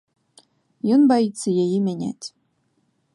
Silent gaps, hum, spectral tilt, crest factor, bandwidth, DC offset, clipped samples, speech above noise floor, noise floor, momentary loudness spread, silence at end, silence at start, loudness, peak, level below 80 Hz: none; none; -6.5 dB/octave; 16 dB; 11.5 kHz; under 0.1%; under 0.1%; 48 dB; -68 dBFS; 16 LU; 0.85 s; 0.85 s; -20 LUFS; -6 dBFS; -70 dBFS